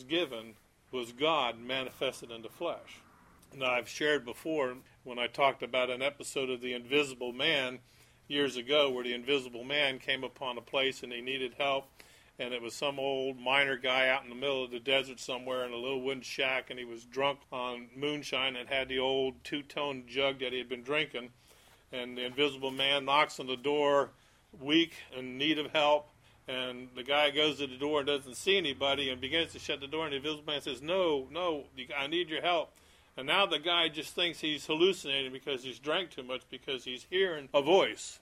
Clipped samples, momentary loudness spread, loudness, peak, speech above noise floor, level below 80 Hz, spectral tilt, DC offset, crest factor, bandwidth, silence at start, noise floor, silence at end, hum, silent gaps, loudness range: under 0.1%; 11 LU; -32 LUFS; -12 dBFS; 28 dB; -70 dBFS; -3 dB/octave; under 0.1%; 22 dB; 16 kHz; 0 s; -61 dBFS; 0.05 s; none; none; 4 LU